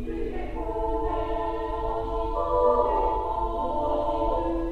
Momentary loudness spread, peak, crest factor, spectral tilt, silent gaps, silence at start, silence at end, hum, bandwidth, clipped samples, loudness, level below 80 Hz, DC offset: 9 LU; -10 dBFS; 16 dB; -8.5 dB/octave; none; 0 s; 0 s; none; 8.6 kHz; under 0.1%; -27 LUFS; -34 dBFS; under 0.1%